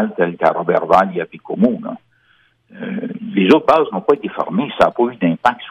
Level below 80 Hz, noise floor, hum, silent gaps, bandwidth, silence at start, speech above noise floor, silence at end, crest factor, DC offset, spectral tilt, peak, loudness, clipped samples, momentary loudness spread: -54 dBFS; -57 dBFS; none; none; 11 kHz; 0 s; 41 dB; 0 s; 16 dB; under 0.1%; -7.5 dB/octave; -2 dBFS; -16 LUFS; under 0.1%; 13 LU